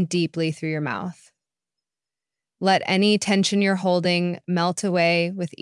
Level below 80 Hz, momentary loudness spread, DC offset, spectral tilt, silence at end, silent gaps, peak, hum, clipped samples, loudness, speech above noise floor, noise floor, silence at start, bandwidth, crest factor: -74 dBFS; 8 LU; under 0.1%; -5 dB/octave; 0.15 s; none; -8 dBFS; none; under 0.1%; -22 LUFS; over 68 dB; under -90 dBFS; 0 s; 11.5 kHz; 16 dB